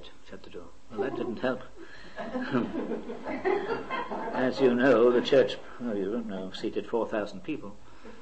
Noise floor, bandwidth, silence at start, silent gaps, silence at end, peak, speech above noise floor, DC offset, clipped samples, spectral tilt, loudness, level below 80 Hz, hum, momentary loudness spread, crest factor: -48 dBFS; 8.6 kHz; 0 s; none; 0 s; -12 dBFS; 20 dB; 0.8%; under 0.1%; -6 dB/octave; -29 LUFS; -60 dBFS; none; 23 LU; 18 dB